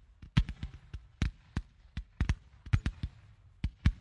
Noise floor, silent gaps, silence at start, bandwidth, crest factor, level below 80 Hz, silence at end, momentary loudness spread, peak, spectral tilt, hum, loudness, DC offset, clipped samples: -58 dBFS; none; 0.2 s; 10.5 kHz; 24 dB; -38 dBFS; 0 s; 14 LU; -12 dBFS; -6.5 dB/octave; none; -37 LUFS; under 0.1%; under 0.1%